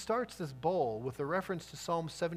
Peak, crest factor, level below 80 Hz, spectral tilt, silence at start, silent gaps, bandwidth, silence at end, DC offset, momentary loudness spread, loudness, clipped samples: -20 dBFS; 16 dB; -64 dBFS; -5.5 dB/octave; 0 s; none; 15.5 kHz; 0 s; under 0.1%; 7 LU; -36 LUFS; under 0.1%